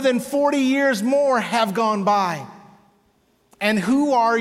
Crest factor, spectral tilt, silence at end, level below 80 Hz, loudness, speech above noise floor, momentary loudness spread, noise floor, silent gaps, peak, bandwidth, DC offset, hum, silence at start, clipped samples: 14 dB; -5 dB/octave; 0 s; -66 dBFS; -19 LUFS; 43 dB; 6 LU; -62 dBFS; none; -6 dBFS; 16 kHz; under 0.1%; none; 0 s; under 0.1%